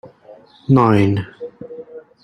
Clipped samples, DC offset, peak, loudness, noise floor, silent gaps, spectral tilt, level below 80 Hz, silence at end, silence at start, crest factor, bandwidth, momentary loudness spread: under 0.1%; under 0.1%; -2 dBFS; -15 LUFS; -44 dBFS; none; -9 dB/octave; -52 dBFS; 0.25 s; 0.05 s; 16 dB; 10.5 kHz; 23 LU